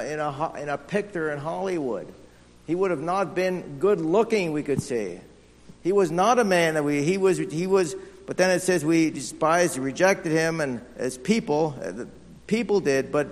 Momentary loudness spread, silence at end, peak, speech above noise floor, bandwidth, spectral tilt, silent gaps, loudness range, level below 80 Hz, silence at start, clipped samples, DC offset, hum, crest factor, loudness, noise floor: 11 LU; 0 s; -6 dBFS; 26 dB; 13.5 kHz; -5 dB/octave; none; 4 LU; -58 dBFS; 0 s; under 0.1%; under 0.1%; none; 18 dB; -24 LUFS; -50 dBFS